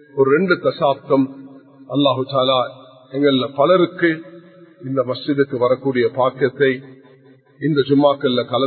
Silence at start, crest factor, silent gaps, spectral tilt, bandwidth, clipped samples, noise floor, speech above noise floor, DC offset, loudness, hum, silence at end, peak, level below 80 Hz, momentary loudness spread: 0.15 s; 18 dB; none; -11.5 dB/octave; 4.5 kHz; under 0.1%; -49 dBFS; 32 dB; under 0.1%; -18 LUFS; none; 0 s; 0 dBFS; -64 dBFS; 10 LU